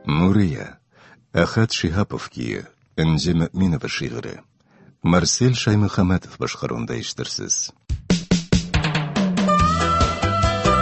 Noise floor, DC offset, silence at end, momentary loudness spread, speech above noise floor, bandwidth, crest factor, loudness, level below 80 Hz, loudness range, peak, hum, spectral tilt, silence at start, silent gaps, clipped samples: -53 dBFS; under 0.1%; 0 s; 11 LU; 32 dB; 8.4 kHz; 20 dB; -21 LUFS; -34 dBFS; 3 LU; -2 dBFS; none; -5 dB/octave; 0.05 s; none; under 0.1%